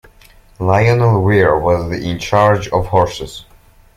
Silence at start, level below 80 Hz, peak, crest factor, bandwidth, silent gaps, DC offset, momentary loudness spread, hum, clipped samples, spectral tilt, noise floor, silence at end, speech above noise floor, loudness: 0.6 s; -36 dBFS; 0 dBFS; 14 dB; 15 kHz; none; under 0.1%; 10 LU; none; under 0.1%; -7 dB/octave; -45 dBFS; 0.55 s; 32 dB; -14 LUFS